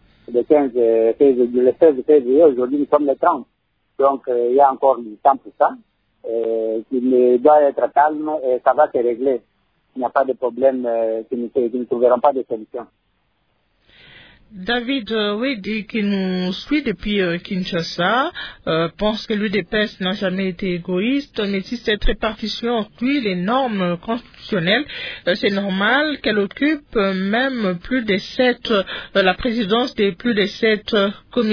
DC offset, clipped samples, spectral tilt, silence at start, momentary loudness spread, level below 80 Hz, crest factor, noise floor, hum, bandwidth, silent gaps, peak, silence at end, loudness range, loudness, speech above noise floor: under 0.1%; under 0.1%; -6.5 dB/octave; 0.3 s; 9 LU; -40 dBFS; 18 dB; -66 dBFS; none; 5.4 kHz; none; -2 dBFS; 0 s; 6 LU; -19 LUFS; 48 dB